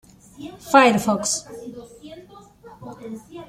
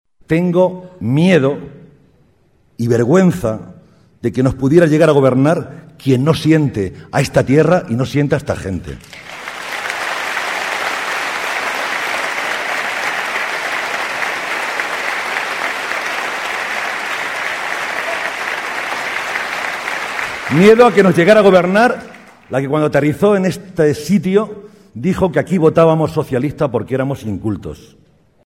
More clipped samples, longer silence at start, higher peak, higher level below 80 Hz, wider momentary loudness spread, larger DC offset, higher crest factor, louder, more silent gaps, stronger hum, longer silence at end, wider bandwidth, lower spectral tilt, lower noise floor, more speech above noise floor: neither; about the same, 0.4 s vs 0.3 s; about the same, -2 dBFS vs 0 dBFS; second, -58 dBFS vs -46 dBFS; first, 26 LU vs 12 LU; neither; first, 22 dB vs 16 dB; second, -18 LUFS vs -15 LUFS; neither; neither; second, 0.05 s vs 0.6 s; about the same, 16 kHz vs 16.5 kHz; second, -3.5 dB/octave vs -6 dB/octave; second, -46 dBFS vs -55 dBFS; second, 25 dB vs 42 dB